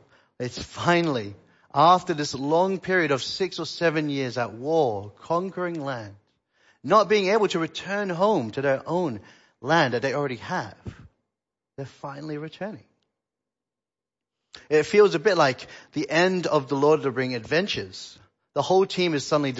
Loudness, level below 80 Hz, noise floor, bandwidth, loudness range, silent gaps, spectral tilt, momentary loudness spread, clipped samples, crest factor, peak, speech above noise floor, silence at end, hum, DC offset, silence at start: -24 LUFS; -62 dBFS; under -90 dBFS; 8 kHz; 11 LU; none; -5 dB/octave; 17 LU; under 0.1%; 20 dB; -4 dBFS; over 66 dB; 0 s; none; under 0.1%; 0.4 s